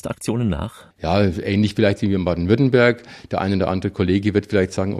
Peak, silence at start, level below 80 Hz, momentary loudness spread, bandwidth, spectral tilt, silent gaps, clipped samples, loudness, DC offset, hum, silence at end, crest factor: -2 dBFS; 0.05 s; -42 dBFS; 10 LU; 14 kHz; -7 dB/octave; none; under 0.1%; -20 LUFS; under 0.1%; none; 0 s; 18 dB